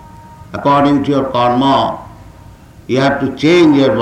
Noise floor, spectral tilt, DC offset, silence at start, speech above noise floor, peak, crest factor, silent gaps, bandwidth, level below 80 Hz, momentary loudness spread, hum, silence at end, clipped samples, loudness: -38 dBFS; -6.5 dB/octave; under 0.1%; 0.25 s; 26 dB; -2 dBFS; 10 dB; none; 9.8 kHz; -42 dBFS; 10 LU; none; 0 s; under 0.1%; -12 LUFS